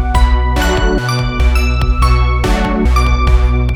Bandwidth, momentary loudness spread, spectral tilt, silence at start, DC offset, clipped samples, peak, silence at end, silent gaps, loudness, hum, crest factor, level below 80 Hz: 12.5 kHz; 2 LU; -6 dB/octave; 0 s; under 0.1%; under 0.1%; 0 dBFS; 0 s; none; -13 LUFS; none; 10 dB; -12 dBFS